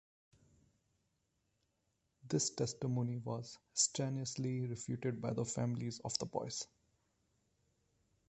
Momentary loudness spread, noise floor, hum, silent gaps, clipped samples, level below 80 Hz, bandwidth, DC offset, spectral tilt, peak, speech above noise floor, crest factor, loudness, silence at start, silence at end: 9 LU; -83 dBFS; none; none; under 0.1%; -72 dBFS; 8.4 kHz; under 0.1%; -4.5 dB/octave; -18 dBFS; 43 dB; 24 dB; -39 LUFS; 2.25 s; 1.65 s